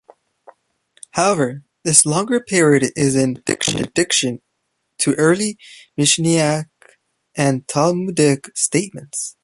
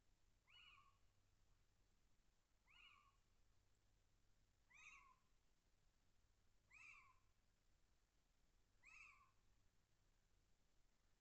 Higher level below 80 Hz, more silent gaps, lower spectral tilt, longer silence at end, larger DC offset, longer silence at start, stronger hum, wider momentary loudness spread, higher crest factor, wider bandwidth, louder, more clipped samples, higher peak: first, -56 dBFS vs -84 dBFS; neither; first, -3.5 dB/octave vs -0.5 dB/octave; about the same, 0.1 s vs 0 s; neither; first, 1.15 s vs 0 s; neither; first, 12 LU vs 5 LU; about the same, 18 dB vs 22 dB; first, 13 kHz vs 8 kHz; first, -17 LUFS vs -67 LUFS; neither; first, 0 dBFS vs -54 dBFS